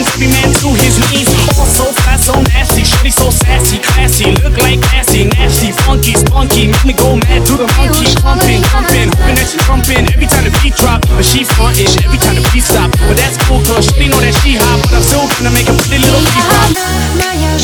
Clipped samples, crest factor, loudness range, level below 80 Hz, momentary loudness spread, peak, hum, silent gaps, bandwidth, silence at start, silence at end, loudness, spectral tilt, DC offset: under 0.1%; 8 dB; 1 LU; -12 dBFS; 2 LU; 0 dBFS; none; none; over 20 kHz; 0 s; 0 s; -9 LUFS; -4 dB/octave; under 0.1%